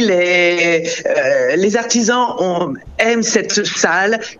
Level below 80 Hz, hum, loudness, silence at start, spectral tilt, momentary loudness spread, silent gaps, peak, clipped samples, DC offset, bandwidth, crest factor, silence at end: -50 dBFS; none; -14 LUFS; 0 s; -3 dB/octave; 5 LU; none; 0 dBFS; under 0.1%; under 0.1%; 8.4 kHz; 14 dB; 0.05 s